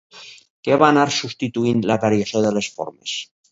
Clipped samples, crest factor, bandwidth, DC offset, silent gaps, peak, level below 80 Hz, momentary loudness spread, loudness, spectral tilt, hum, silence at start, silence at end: under 0.1%; 20 dB; 8 kHz; under 0.1%; 0.50-0.63 s; 0 dBFS; -60 dBFS; 15 LU; -19 LUFS; -5 dB/octave; none; 0.15 s; 0.3 s